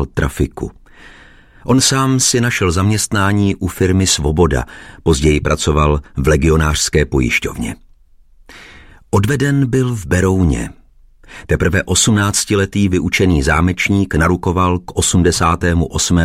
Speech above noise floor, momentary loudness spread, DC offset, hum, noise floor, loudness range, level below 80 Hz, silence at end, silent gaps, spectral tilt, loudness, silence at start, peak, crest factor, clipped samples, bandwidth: 32 dB; 8 LU; under 0.1%; none; -46 dBFS; 4 LU; -26 dBFS; 0 s; none; -4.5 dB/octave; -14 LUFS; 0 s; 0 dBFS; 14 dB; under 0.1%; 16 kHz